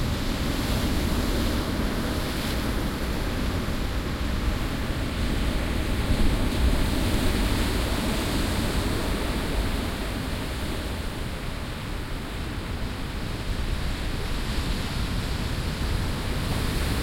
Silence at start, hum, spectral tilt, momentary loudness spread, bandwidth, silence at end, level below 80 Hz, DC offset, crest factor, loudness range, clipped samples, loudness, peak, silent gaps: 0 s; none; -5 dB/octave; 7 LU; 16.5 kHz; 0 s; -30 dBFS; under 0.1%; 16 dB; 6 LU; under 0.1%; -28 LUFS; -10 dBFS; none